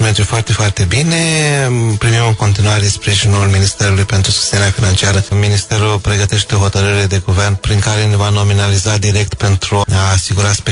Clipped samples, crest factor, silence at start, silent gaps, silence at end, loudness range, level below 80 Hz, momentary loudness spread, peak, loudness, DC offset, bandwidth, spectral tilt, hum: under 0.1%; 10 dB; 0 s; none; 0 s; 1 LU; -30 dBFS; 2 LU; 0 dBFS; -12 LUFS; under 0.1%; 11 kHz; -4 dB/octave; none